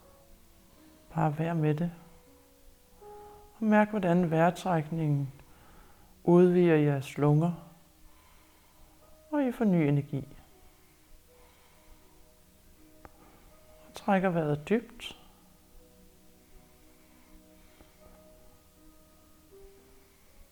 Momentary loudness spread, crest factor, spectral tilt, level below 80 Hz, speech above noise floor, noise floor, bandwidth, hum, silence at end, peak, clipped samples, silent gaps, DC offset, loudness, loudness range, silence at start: 20 LU; 20 dB; -8 dB/octave; -60 dBFS; 33 dB; -59 dBFS; 19.5 kHz; none; 0.85 s; -10 dBFS; under 0.1%; none; under 0.1%; -28 LUFS; 9 LU; 1.1 s